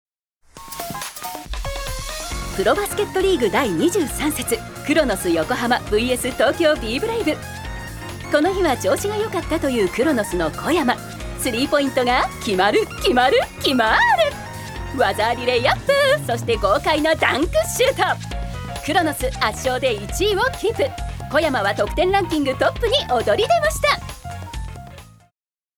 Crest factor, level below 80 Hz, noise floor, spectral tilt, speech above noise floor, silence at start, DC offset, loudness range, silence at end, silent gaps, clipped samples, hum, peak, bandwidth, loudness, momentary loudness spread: 18 dB; -36 dBFS; -73 dBFS; -4 dB/octave; 54 dB; 0.55 s; under 0.1%; 3 LU; 0.7 s; none; under 0.1%; none; -2 dBFS; over 20 kHz; -19 LUFS; 13 LU